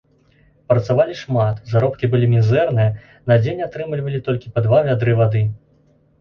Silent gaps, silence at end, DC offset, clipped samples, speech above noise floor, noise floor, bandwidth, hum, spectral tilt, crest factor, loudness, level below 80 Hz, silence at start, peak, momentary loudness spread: none; 0.65 s; under 0.1%; under 0.1%; 39 dB; -56 dBFS; 6.4 kHz; none; -9 dB/octave; 16 dB; -18 LUFS; -48 dBFS; 0.7 s; -2 dBFS; 9 LU